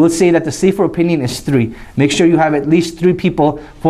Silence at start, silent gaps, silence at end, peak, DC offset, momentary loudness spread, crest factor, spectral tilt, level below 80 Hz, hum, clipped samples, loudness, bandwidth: 0 s; none; 0 s; -2 dBFS; under 0.1%; 5 LU; 12 dB; -6 dB/octave; -40 dBFS; none; under 0.1%; -14 LUFS; 14 kHz